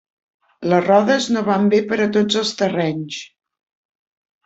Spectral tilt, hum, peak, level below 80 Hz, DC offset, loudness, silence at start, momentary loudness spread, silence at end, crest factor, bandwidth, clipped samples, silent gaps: -5 dB/octave; none; -2 dBFS; -62 dBFS; under 0.1%; -18 LUFS; 0.6 s; 13 LU; 1.2 s; 18 dB; 8 kHz; under 0.1%; none